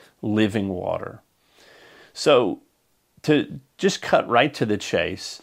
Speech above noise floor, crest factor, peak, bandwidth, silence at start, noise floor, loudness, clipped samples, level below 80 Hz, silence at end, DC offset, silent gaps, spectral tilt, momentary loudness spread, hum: 45 dB; 22 dB; -2 dBFS; 15.5 kHz; 0.25 s; -67 dBFS; -22 LUFS; under 0.1%; -60 dBFS; 0.05 s; under 0.1%; none; -5 dB/octave; 13 LU; none